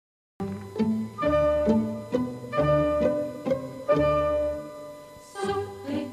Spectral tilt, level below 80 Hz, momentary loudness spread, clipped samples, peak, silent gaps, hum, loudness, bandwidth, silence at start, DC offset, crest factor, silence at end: -7.5 dB/octave; -46 dBFS; 14 LU; under 0.1%; -10 dBFS; none; none; -26 LUFS; 13.5 kHz; 0.4 s; under 0.1%; 18 dB; 0 s